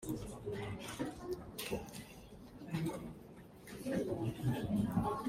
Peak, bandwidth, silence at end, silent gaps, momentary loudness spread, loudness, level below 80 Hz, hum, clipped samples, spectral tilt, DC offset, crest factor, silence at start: -22 dBFS; 16 kHz; 0 s; none; 18 LU; -41 LUFS; -58 dBFS; none; under 0.1%; -6.5 dB/octave; under 0.1%; 18 dB; 0 s